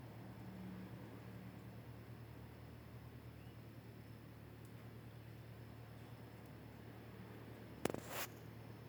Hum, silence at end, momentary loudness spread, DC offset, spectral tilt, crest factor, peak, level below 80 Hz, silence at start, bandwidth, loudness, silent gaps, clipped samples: none; 0 s; 11 LU; under 0.1%; -5.5 dB/octave; 38 dB; -14 dBFS; -68 dBFS; 0 s; over 20 kHz; -53 LUFS; none; under 0.1%